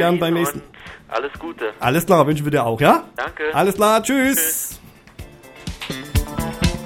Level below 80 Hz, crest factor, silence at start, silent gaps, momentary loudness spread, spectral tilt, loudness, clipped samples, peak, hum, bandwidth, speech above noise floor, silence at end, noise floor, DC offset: -34 dBFS; 20 dB; 0 s; none; 16 LU; -4.5 dB/octave; -19 LUFS; under 0.1%; 0 dBFS; none; 17 kHz; 21 dB; 0 s; -40 dBFS; under 0.1%